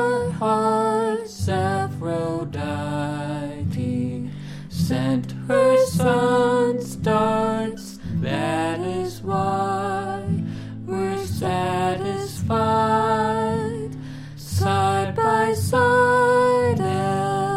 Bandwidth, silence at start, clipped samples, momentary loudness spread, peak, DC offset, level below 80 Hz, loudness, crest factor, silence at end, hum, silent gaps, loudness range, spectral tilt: 16 kHz; 0 s; under 0.1%; 11 LU; -6 dBFS; under 0.1%; -50 dBFS; -22 LUFS; 14 dB; 0 s; none; none; 6 LU; -6 dB/octave